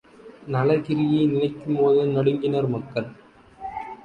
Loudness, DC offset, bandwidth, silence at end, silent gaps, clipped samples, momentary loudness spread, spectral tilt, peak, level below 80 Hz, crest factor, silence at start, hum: -22 LUFS; under 0.1%; 5.2 kHz; 0.1 s; none; under 0.1%; 16 LU; -9.5 dB/octave; -8 dBFS; -58 dBFS; 16 dB; 0.25 s; none